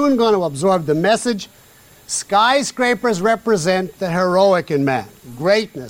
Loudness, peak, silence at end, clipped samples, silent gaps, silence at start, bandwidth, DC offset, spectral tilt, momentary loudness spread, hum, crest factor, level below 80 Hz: -17 LUFS; -2 dBFS; 0 s; under 0.1%; none; 0 s; 16.5 kHz; under 0.1%; -4.5 dB/octave; 9 LU; none; 14 dB; -56 dBFS